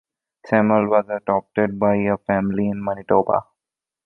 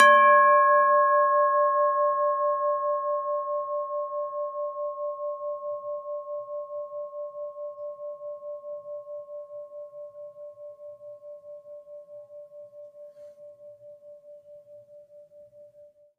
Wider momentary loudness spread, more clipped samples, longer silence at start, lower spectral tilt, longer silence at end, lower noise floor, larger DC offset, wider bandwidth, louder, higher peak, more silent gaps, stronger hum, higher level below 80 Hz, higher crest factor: second, 6 LU vs 26 LU; neither; first, 0.45 s vs 0 s; first, -10.5 dB/octave vs -2 dB/octave; first, 0.65 s vs 0.35 s; first, -88 dBFS vs -55 dBFS; neither; second, 4.3 kHz vs 11 kHz; first, -20 LUFS vs -25 LUFS; about the same, -2 dBFS vs -4 dBFS; neither; neither; first, -54 dBFS vs -90 dBFS; about the same, 18 dB vs 22 dB